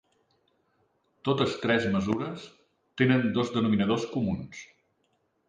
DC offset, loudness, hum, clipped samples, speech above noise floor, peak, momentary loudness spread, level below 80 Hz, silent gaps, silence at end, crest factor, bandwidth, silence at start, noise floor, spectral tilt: under 0.1%; -27 LUFS; none; under 0.1%; 46 dB; -8 dBFS; 16 LU; -58 dBFS; none; 0.85 s; 20 dB; 9.4 kHz; 1.25 s; -73 dBFS; -6.5 dB/octave